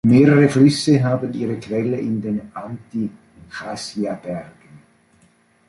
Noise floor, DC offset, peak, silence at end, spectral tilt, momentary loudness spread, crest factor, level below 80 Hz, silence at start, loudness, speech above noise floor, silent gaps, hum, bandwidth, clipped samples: -57 dBFS; under 0.1%; -2 dBFS; 0.9 s; -7 dB/octave; 19 LU; 18 dB; -56 dBFS; 0.05 s; -19 LUFS; 39 dB; none; none; 11.5 kHz; under 0.1%